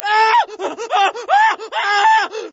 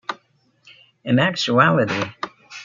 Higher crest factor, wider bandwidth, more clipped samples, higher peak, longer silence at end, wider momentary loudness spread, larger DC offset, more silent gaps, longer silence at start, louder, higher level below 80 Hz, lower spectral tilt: second, 14 dB vs 20 dB; about the same, 8 kHz vs 7.6 kHz; neither; about the same, -2 dBFS vs -2 dBFS; about the same, 0.05 s vs 0 s; second, 7 LU vs 18 LU; neither; neither; about the same, 0 s vs 0.1 s; first, -15 LUFS vs -18 LUFS; second, -74 dBFS vs -64 dBFS; second, 0.5 dB/octave vs -5.5 dB/octave